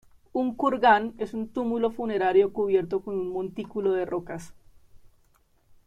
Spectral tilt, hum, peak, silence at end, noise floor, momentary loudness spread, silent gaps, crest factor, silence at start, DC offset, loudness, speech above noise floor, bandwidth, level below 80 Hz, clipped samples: -6.5 dB/octave; none; -6 dBFS; 0.9 s; -63 dBFS; 12 LU; none; 20 dB; 0.35 s; under 0.1%; -26 LUFS; 38 dB; 9.8 kHz; -58 dBFS; under 0.1%